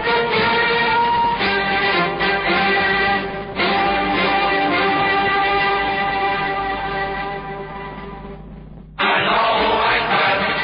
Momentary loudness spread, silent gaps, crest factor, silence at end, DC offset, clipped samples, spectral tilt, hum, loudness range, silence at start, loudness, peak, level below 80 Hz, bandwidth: 14 LU; none; 12 dB; 0 s; under 0.1%; under 0.1%; -9.5 dB/octave; none; 5 LU; 0 s; -17 LUFS; -6 dBFS; -42 dBFS; 5.4 kHz